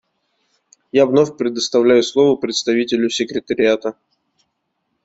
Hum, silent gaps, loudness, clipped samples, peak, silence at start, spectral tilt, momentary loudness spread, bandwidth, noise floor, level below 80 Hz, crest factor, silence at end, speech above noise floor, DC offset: none; none; -16 LUFS; under 0.1%; -2 dBFS; 0.95 s; -4 dB/octave; 8 LU; 8 kHz; -72 dBFS; -60 dBFS; 16 dB; 1.15 s; 56 dB; under 0.1%